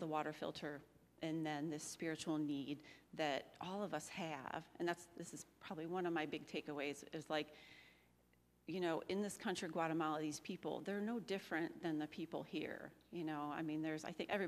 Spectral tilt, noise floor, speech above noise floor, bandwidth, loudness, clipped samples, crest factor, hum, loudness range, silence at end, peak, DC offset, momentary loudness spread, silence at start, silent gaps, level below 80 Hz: -5 dB/octave; -75 dBFS; 30 dB; 15 kHz; -45 LUFS; under 0.1%; 20 dB; none; 3 LU; 0 s; -26 dBFS; under 0.1%; 10 LU; 0 s; none; -82 dBFS